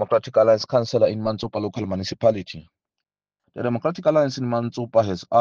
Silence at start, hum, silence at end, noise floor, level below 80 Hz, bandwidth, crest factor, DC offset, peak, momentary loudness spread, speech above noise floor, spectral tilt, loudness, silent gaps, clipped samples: 0 s; none; 0 s; -73 dBFS; -60 dBFS; 7.2 kHz; 16 dB; under 0.1%; -4 dBFS; 10 LU; 52 dB; -6.5 dB/octave; -22 LUFS; none; under 0.1%